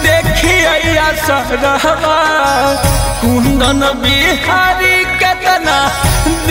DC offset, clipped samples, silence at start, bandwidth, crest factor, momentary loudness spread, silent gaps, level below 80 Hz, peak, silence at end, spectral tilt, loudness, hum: under 0.1%; under 0.1%; 0 s; 16.5 kHz; 10 dB; 4 LU; none; -22 dBFS; 0 dBFS; 0 s; -3.5 dB/octave; -11 LUFS; none